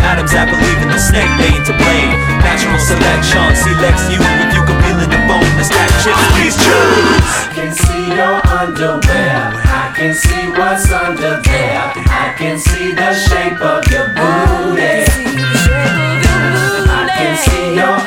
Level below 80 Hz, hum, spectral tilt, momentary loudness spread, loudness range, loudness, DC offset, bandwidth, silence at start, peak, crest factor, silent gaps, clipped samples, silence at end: -18 dBFS; none; -4.5 dB/octave; 5 LU; 3 LU; -11 LUFS; under 0.1%; 17 kHz; 0 s; 0 dBFS; 10 dB; none; 0.1%; 0 s